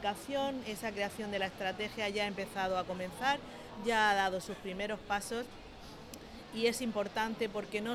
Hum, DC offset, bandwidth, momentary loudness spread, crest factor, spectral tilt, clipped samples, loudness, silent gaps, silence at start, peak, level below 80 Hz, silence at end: none; under 0.1%; 17 kHz; 16 LU; 18 dB; -3.5 dB/octave; under 0.1%; -35 LUFS; none; 0 s; -18 dBFS; -60 dBFS; 0 s